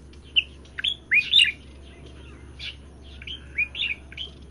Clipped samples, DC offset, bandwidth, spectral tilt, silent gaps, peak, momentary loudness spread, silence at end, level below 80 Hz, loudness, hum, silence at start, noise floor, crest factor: under 0.1%; under 0.1%; 12.5 kHz; -1 dB/octave; none; -6 dBFS; 20 LU; 0.05 s; -46 dBFS; -22 LUFS; none; 0.05 s; -44 dBFS; 22 dB